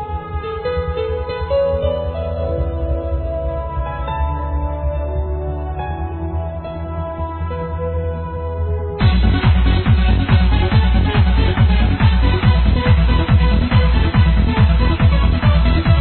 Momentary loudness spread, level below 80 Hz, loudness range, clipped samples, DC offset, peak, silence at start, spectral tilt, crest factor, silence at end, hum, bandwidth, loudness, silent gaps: 10 LU; -18 dBFS; 9 LU; under 0.1%; 0.2%; 0 dBFS; 0 s; -11 dB/octave; 14 dB; 0 s; none; 4.4 kHz; -17 LUFS; none